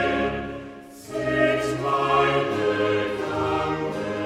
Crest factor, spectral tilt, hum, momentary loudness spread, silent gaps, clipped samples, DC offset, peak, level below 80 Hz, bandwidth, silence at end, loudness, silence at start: 16 dB; -5.5 dB/octave; none; 14 LU; none; under 0.1%; under 0.1%; -6 dBFS; -48 dBFS; 14 kHz; 0 s; -24 LUFS; 0 s